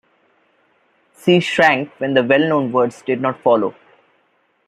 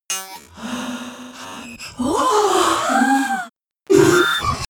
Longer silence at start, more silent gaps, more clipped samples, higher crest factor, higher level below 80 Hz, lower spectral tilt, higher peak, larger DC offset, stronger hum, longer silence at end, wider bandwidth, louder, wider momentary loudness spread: first, 1.25 s vs 0.1 s; neither; neither; about the same, 16 dB vs 18 dB; second, -66 dBFS vs -46 dBFS; first, -6 dB/octave vs -3.5 dB/octave; about the same, -2 dBFS vs -2 dBFS; neither; neither; first, 0.95 s vs 0.05 s; second, 13 kHz vs 20 kHz; about the same, -16 LUFS vs -17 LUFS; second, 7 LU vs 19 LU